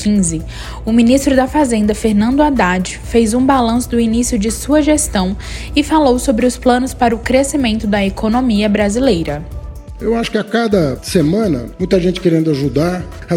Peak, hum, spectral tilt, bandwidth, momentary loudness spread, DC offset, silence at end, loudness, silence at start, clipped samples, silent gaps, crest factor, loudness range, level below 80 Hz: 0 dBFS; none; -5 dB/octave; 16.5 kHz; 7 LU; under 0.1%; 0 s; -14 LUFS; 0 s; under 0.1%; none; 14 dB; 3 LU; -30 dBFS